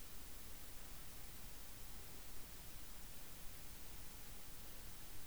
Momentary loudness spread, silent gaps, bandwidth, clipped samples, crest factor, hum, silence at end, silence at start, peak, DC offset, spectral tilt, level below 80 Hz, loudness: 0 LU; none; over 20 kHz; under 0.1%; 14 dB; none; 0 s; 0 s; -38 dBFS; 0.3%; -2.5 dB/octave; -60 dBFS; -53 LUFS